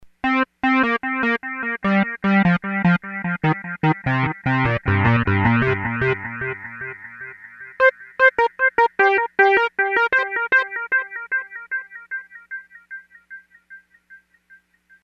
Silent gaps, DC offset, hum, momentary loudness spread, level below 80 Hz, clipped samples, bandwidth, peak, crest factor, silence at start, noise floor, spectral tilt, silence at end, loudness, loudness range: none; under 0.1%; none; 18 LU; -48 dBFS; under 0.1%; 7.2 kHz; -2 dBFS; 18 dB; 0.25 s; -54 dBFS; -8 dB/octave; 0.85 s; -19 LUFS; 10 LU